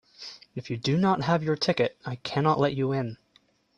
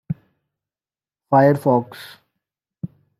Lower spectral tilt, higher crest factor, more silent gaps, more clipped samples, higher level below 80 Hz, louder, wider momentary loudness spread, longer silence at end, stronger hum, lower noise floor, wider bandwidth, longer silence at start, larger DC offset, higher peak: second, -6.5 dB/octave vs -8.5 dB/octave; about the same, 18 dB vs 20 dB; neither; neither; about the same, -62 dBFS vs -64 dBFS; second, -26 LUFS vs -17 LUFS; second, 15 LU vs 21 LU; first, 0.65 s vs 0.35 s; neither; second, -65 dBFS vs under -90 dBFS; second, 10 kHz vs 14.5 kHz; about the same, 0.2 s vs 0.1 s; neither; second, -10 dBFS vs -2 dBFS